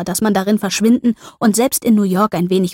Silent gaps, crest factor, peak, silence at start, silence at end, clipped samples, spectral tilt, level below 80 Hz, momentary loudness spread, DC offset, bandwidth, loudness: none; 12 dB; -4 dBFS; 0 s; 0 s; under 0.1%; -5 dB/octave; -52 dBFS; 3 LU; under 0.1%; 16.5 kHz; -15 LUFS